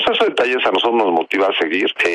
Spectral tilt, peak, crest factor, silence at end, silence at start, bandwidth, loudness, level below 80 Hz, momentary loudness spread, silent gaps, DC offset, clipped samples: -3.5 dB/octave; -4 dBFS; 12 dB; 0 s; 0 s; 10.5 kHz; -16 LUFS; -60 dBFS; 2 LU; none; under 0.1%; under 0.1%